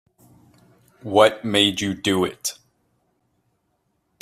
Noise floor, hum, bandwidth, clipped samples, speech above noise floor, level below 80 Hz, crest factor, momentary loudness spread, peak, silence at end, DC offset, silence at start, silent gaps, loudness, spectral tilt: -71 dBFS; none; 15.5 kHz; under 0.1%; 51 dB; -62 dBFS; 22 dB; 12 LU; -2 dBFS; 1.7 s; under 0.1%; 1.05 s; none; -20 LUFS; -3.5 dB/octave